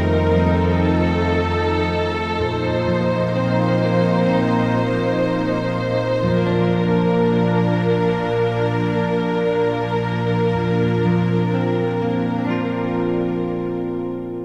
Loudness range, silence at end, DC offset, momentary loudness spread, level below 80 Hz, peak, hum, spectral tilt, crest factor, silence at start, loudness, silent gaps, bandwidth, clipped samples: 1 LU; 0 s; under 0.1%; 4 LU; -40 dBFS; -6 dBFS; none; -8.5 dB/octave; 14 dB; 0 s; -19 LUFS; none; 7.8 kHz; under 0.1%